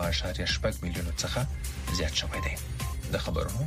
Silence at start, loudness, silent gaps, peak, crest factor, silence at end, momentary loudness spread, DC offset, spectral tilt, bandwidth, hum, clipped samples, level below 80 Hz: 0 s; -31 LUFS; none; -16 dBFS; 16 dB; 0 s; 6 LU; under 0.1%; -4 dB/octave; 15.5 kHz; none; under 0.1%; -36 dBFS